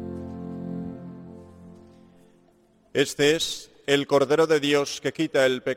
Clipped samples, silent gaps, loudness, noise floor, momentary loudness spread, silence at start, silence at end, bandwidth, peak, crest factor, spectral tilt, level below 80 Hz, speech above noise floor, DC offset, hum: under 0.1%; none; -24 LUFS; -60 dBFS; 17 LU; 0 s; 0 s; 16.5 kHz; -8 dBFS; 18 dB; -4 dB/octave; -60 dBFS; 38 dB; under 0.1%; none